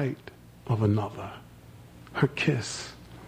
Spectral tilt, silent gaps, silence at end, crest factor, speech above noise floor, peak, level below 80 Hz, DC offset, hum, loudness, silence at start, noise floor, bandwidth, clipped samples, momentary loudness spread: -6 dB/octave; none; 0 s; 22 dB; 22 dB; -8 dBFS; -56 dBFS; under 0.1%; none; -29 LUFS; 0 s; -49 dBFS; 15 kHz; under 0.1%; 24 LU